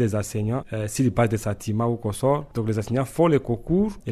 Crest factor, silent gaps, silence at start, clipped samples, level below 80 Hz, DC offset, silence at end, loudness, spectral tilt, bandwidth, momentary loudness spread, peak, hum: 16 dB; none; 0 s; under 0.1%; -46 dBFS; under 0.1%; 0 s; -24 LUFS; -7 dB/octave; 13.5 kHz; 6 LU; -8 dBFS; none